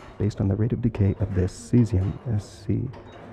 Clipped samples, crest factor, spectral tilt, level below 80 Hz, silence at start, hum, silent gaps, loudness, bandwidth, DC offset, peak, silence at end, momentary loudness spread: under 0.1%; 16 dB; -8.5 dB/octave; -42 dBFS; 0 s; none; none; -25 LUFS; 9.4 kHz; under 0.1%; -8 dBFS; 0 s; 8 LU